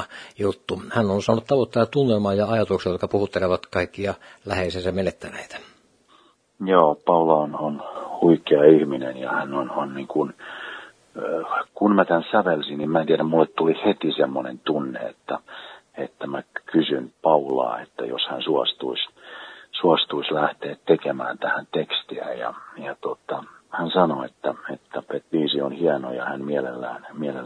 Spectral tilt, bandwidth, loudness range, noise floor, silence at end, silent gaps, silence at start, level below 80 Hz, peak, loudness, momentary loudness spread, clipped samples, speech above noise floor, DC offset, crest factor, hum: -6.5 dB/octave; 10.5 kHz; 6 LU; -57 dBFS; 0 s; none; 0 s; -60 dBFS; 0 dBFS; -23 LUFS; 14 LU; under 0.1%; 35 dB; under 0.1%; 22 dB; none